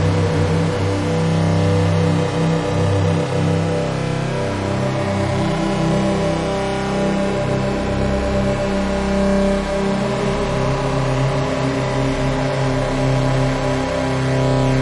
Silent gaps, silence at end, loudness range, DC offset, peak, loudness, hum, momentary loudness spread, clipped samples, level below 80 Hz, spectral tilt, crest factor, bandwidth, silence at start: none; 0 s; 2 LU; under 0.1%; -6 dBFS; -19 LUFS; none; 3 LU; under 0.1%; -32 dBFS; -6.5 dB/octave; 12 dB; 11.5 kHz; 0 s